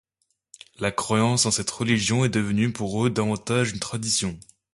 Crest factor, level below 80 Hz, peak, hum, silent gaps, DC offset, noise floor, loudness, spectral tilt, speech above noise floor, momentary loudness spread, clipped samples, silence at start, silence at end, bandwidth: 18 dB; -52 dBFS; -6 dBFS; none; none; under 0.1%; -72 dBFS; -24 LUFS; -4 dB/octave; 49 dB; 7 LU; under 0.1%; 0.8 s; 0.3 s; 11.5 kHz